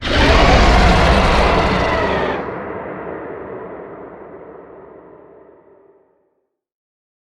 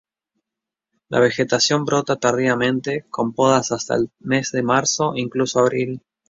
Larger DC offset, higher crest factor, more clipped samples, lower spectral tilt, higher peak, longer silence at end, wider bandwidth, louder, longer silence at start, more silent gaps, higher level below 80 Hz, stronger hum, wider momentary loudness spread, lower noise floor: neither; about the same, 18 dB vs 18 dB; neither; first, -5.5 dB/octave vs -4 dB/octave; about the same, 0 dBFS vs -2 dBFS; first, 2.3 s vs 0.3 s; first, 11 kHz vs 7.8 kHz; first, -14 LUFS vs -19 LUFS; second, 0 s vs 1.1 s; neither; first, -22 dBFS vs -58 dBFS; neither; first, 24 LU vs 7 LU; second, -69 dBFS vs -86 dBFS